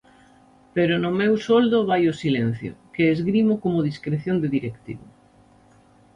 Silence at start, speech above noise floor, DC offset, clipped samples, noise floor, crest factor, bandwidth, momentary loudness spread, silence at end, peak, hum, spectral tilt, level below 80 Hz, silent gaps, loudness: 0.75 s; 33 dB; under 0.1%; under 0.1%; -54 dBFS; 16 dB; 9.6 kHz; 14 LU; 1.1 s; -6 dBFS; none; -7.5 dB/octave; -58 dBFS; none; -22 LUFS